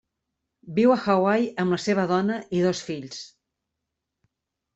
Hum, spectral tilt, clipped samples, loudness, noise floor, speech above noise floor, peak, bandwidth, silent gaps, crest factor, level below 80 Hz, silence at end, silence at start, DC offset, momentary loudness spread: none; -6 dB/octave; under 0.1%; -23 LUFS; -83 dBFS; 60 dB; -6 dBFS; 8.2 kHz; none; 18 dB; -66 dBFS; 1.5 s; 0.65 s; under 0.1%; 13 LU